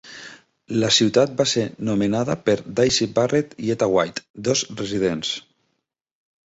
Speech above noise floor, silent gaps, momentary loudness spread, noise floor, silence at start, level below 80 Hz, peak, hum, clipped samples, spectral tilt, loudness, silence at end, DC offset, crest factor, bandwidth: 55 dB; 4.30-4.34 s; 10 LU; -76 dBFS; 0.05 s; -56 dBFS; -4 dBFS; none; under 0.1%; -4 dB/octave; -21 LUFS; 1.15 s; under 0.1%; 18 dB; 8.2 kHz